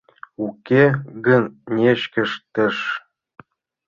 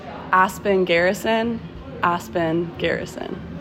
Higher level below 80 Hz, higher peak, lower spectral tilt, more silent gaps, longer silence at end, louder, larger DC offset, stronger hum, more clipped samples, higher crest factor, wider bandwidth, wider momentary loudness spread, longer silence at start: second, -60 dBFS vs -48 dBFS; about the same, -2 dBFS vs -4 dBFS; first, -7.5 dB/octave vs -5.5 dB/octave; neither; first, 0.9 s vs 0 s; about the same, -20 LUFS vs -21 LUFS; neither; neither; neither; about the same, 18 dB vs 18 dB; second, 7.2 kHz vs 16 kHz; about the same, 13 LU vs 13 LU; first, 0.4 s vs 0 s